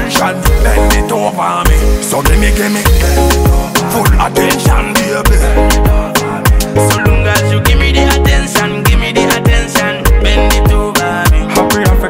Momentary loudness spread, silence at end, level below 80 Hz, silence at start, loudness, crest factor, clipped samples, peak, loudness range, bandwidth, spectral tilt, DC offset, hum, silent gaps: 3 LU; 0 s; -12 dBFS; 0 s; -10 LUFS; 8 dB; under 0.1%; 0 dBFS; 1 LU; 16.5 kHz; -4.5 dB/octave; under 0.1%; none; none